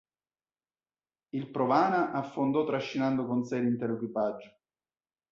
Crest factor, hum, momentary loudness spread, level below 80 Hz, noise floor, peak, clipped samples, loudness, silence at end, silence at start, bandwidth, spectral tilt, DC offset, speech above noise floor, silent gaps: 20 dB; none; 10 LU; -72 dBFS; under -90 dBFS; -12 dBFS; under 0.1%; -30 LUFS; 0.85 s; 1.35 s; 7.4 kHz; -7.5 dB/octave; under 0.1%; over 61 dB; none